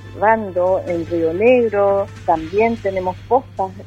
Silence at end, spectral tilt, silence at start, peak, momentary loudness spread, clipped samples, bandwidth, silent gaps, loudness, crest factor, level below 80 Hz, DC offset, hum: 0 s; -7.5 dB/octave; 0 s; -2 dBFS; 8 LU; under 0.1%; 8.4 kHz; none; -18 LUFS; 16 dB; -46 dBFS; under 0.1%; none